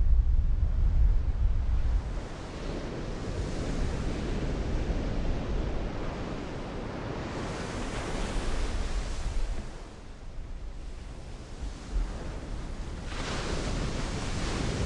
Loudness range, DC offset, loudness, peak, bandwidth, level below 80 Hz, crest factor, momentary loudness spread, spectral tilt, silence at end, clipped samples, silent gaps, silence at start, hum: 8 LU; under 0.1%; -34 LUFS; -12 dBFS; 11 kHz; -30 dBFS; 18 dB; 14 LU; -5.5 dB/octave; 0 s; under 0.1%; none; 0 s; none